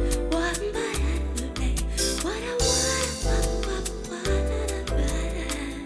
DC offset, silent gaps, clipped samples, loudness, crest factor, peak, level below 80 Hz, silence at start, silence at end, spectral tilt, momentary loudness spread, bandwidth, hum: under 0.1%; none; under 0.1%; -27 LUFS; 16 dB; -10 dBFS; -30 dBFS; 0 s; 0 s; -3.5 dB/octave; 7 LU; 11 kHz; none